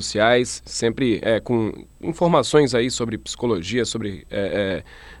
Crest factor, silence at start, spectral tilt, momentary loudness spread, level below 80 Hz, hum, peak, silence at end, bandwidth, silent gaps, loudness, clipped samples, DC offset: 18 dB; 0 s; -4.5 dB/octave; 11 LU; -46 dBFS; none; -4 dBFS; 0 s; 12.5 kHz; none; -21 LUFS; under 0.1%; under 0.1%